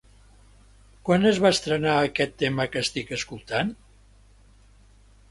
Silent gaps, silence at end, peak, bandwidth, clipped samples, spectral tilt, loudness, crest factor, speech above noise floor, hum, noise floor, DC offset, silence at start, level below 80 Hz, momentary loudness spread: none; 1.55 s; -4 dBFS; 11.5 kHz; under 0.1%; -4.5 dB/octave; -24 LUFS; 22 dB; 31 dB; 50 Hz at -50 dBFS; -54 dBFS; under 0.1%; 1.05 s; -52 dBFS; 11 LU